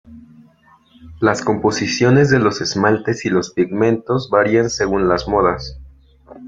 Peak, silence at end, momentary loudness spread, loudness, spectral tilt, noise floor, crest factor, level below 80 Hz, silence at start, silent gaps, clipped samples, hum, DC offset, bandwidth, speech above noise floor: -2 dBFS; 0 s; 6 LU; -16 LUFS; -5.5 dB/octave; -51 dBFS; 16 dB; -42 dBFS; 0.1 s; none; under 0.1%; none; under 0.1%; 7.8 kHz; 35 dB